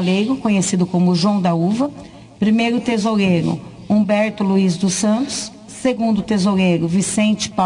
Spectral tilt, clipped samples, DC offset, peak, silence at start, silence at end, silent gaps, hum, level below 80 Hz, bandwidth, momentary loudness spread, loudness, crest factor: -5.5 dB/octave; under 0.1%; under 0.1%; -6 dBFS; 0 s; 0 s; none; none; -52 dBFS; 10.5 kHz; 7 LU; -17 LUFS; 12 dB